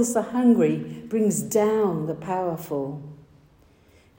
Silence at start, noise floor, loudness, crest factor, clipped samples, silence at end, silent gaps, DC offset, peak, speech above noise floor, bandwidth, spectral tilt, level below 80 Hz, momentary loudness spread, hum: 0 s; -56 dBFS; -24 LUFS; 16 dB; under 0.1%; 1.05 s; none; under 0.1%; -8 dBFS; 33 dB; 16.5 kHz; -6 dB/octave; -62 dBFS; 11 LU; none